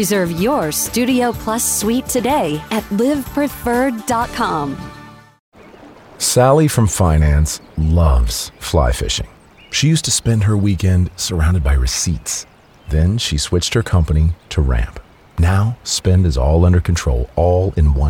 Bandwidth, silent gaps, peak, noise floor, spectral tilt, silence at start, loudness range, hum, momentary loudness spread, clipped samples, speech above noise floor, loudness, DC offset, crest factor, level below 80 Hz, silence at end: 17 kHz; 5.39-5.52 s; -2 dBFS; -40 dBFS; -5 dB/octave; 0 s; 3 LU; none; 7 LU; under 0.1%; 25 dB; -16 LUFS; under 0.1%; 14 dB; -24 dBFS; 0 s